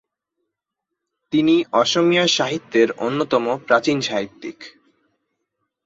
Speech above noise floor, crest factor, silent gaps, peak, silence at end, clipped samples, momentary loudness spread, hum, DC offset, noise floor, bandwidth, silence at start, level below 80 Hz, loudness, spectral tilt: 63 dB; 18 dB; none; -2 dBFS; 1.15 s; under 0.1%; 9 LU; none; under 0.1%; -82 dBFS; 7.8 kHz; 1.3 s; -64 dBFS; -18 LUFS; -4 dB/octave